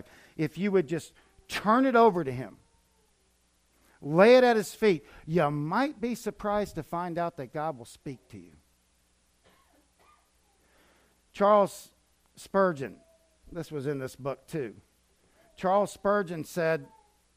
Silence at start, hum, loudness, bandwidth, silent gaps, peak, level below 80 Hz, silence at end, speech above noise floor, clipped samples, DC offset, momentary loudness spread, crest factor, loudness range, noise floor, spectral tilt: 0.4 s; none; -27 LUFS; 15.5 kHz; none; -8 dBFS; -62 dBFS; 0.5 s; 42 dB; under 0.1%; under 0.1%; 19 LU; 20 dB; 11 LU; -69 dBFS; -6 dB/octave